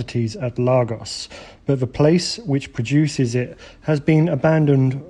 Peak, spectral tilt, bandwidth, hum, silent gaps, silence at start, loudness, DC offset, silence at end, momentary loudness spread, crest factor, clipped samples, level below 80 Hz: -2 dBFS; -6.5 dB/octave; 11.5 kHz; none; none; 0 s; -19 LUFS; under 0.1%; 0 s; 13 LU; 16 dB; under 0.1%; -48 dBFS